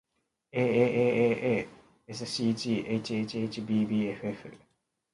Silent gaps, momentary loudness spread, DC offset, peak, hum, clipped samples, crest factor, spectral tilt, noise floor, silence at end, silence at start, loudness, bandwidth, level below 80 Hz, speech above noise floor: none; 13 LU; under 0.1%; -12 dBFS; none; under 0.1%; 18 dB; -6 dB/octave; -76 dBFS; 0.6 s; 0.55 s; -29 LUFS; 11.5 kHz; -66 dBFS; 47 dB